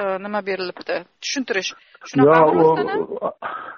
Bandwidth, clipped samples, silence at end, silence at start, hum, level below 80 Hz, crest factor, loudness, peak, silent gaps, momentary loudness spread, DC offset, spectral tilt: 7 kHz; under 0.1%; 0 s; 0 s; none; -62 dBFS; 16 dB; -19 LUFS; -2 dBFS; none; 14 LU; under 0.1%; -4 dB/octave